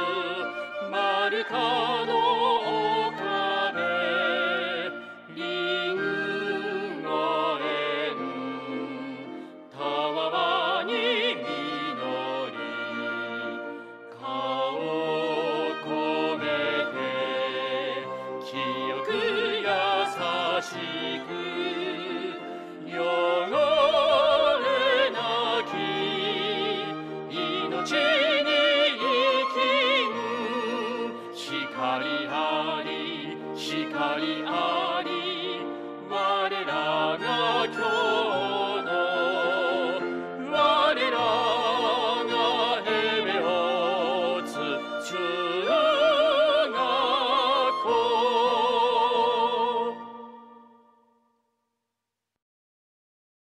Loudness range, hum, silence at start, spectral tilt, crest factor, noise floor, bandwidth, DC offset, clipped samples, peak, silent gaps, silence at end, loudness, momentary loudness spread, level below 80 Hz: 6 LU; none; 0 s; -4 dB/octave; 16 dB; -85 dBFS; 13 kHz; under 0.1%; under 0.1%; -10 dBFS; none; 2.95 s; -26 LUFS; 11 LU; -70 dBFS